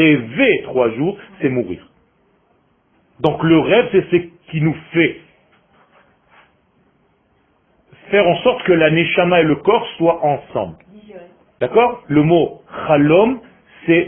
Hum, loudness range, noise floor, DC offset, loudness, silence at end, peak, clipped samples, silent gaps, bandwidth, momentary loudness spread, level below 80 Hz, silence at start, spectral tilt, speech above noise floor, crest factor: none; 8 LU; -59 dBFS; under 0.1%; -16 LUFS; 0 s; 0 dBFS; under 0.1%; none; 3.8 kHz; 12 LU; -50 dBFS; 0 s; -10 dB/octave; 44 dB; 16 dB